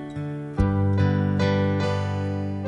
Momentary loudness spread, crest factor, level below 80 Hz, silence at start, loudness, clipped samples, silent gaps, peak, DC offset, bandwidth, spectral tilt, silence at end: 8 LU; 16 dB; -38 dBFS; 0 s; -24 LUFS; under 0.1%; none; -8 dBFS; under 0.1%; 7.6 kHz; -8 dB/octave; 0 s